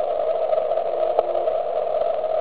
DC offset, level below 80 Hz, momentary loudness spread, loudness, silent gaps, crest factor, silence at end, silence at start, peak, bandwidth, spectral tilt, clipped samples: 1%; -60 dBFS; 2 LU; -22 LUFS; none; 18 dB; 0 s; 0 s; -4 dBFS; 4.7 kHz; -8.5 dB/octave; under 0.1%